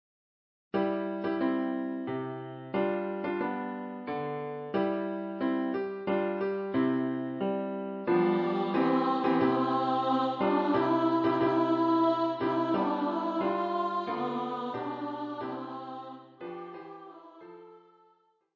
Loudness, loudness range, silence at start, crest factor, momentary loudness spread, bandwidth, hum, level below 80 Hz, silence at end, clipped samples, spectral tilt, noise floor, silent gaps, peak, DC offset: -30 LUFS; 9 LU; 0.75 s; 16 dB; 14 LU; 6.6 kHz; none; -70 dBFS; 0.75 s; under 0.1%; -8.5 dB/octave; -68 dBFS; none; -14 dBFS; under 0.1%